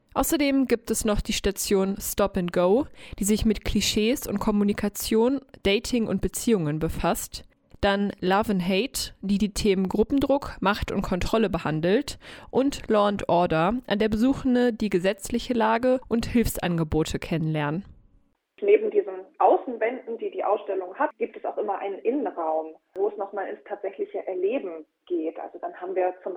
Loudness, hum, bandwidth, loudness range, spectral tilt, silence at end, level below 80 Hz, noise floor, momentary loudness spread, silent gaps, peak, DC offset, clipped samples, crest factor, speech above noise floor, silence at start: -25 LUFS; none; 19.5 kHz; 5 LU; -5 dB/octave; 0 s; -42 dBFS; -63 dBFS; 9 LU; none; -6 dBFS; under 0.1%; under 0.1%; 18 dB; 38 dB; 0.15 s